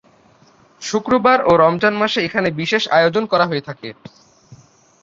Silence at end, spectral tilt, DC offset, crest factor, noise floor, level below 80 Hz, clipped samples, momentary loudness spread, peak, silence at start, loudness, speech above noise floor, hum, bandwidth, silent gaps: 0.5 s; -5 dB/octave; under 0.1%; 16 dB; -51 dBFS; -54 dBFS; under 0.1%; 16 LU; -2 dBFS; 0.8 s; -16 LUFS; 35 dB; none; 7.8 kHz; none